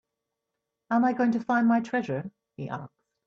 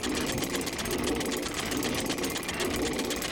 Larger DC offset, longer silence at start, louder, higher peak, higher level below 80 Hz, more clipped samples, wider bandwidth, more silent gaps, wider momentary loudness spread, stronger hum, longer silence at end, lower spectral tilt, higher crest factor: neither; first, 0.9 s vs 0 s; first, -27 LUFS vs -30 LUFS; about the same, -12 dBFS vs -14 dBFS; second, -72 dBFS vs -46 dBFS; neither; second, 7 kHz vs over 20 kHz; neither; first, 15 LU vs 1 LU; neither; first, 0.4 s vs 0 s; first, -7.5 dB/octave vs -3 dB/octave; about the same, 16 dB vs 16 dB